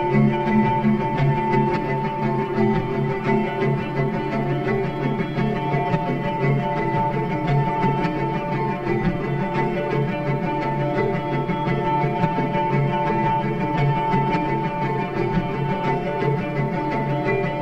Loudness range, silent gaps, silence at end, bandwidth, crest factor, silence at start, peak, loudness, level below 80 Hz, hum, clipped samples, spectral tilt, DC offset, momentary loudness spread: 2 LU; none; 0 s; 6.4 kHz; 16 dB; 0 s; -6 dBFS; -22 LUFS; -40 dBFS; none; under 0.1%; -9 dB/octave; under 0.1%; 4 LU